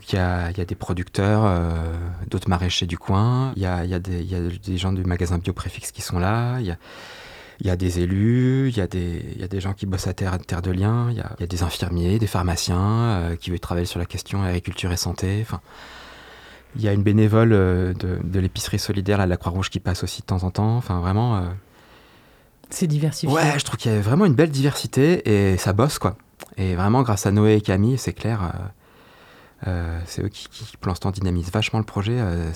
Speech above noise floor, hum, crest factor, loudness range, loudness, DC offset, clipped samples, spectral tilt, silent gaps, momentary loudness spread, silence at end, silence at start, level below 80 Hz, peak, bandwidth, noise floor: 31 dB; none; 18 dB; 6 LU; -22 LUFS; under 0.1%; under 0.1%; -6 dB/octave; none; 12 LU; 0 s; 0 s; -44 dBFS; -4 dBFS; 15 kHz; -53 dBFS